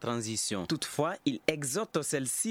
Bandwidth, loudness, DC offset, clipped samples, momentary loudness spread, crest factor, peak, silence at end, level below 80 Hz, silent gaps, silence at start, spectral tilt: 18.5 kHz; -32 LUFS; under 0.1%; under 0.1%; 2 LU; 22 dB; -10 dBFS; 0 s; -66 dBFS; none; 0 s; -3.5 dB/octave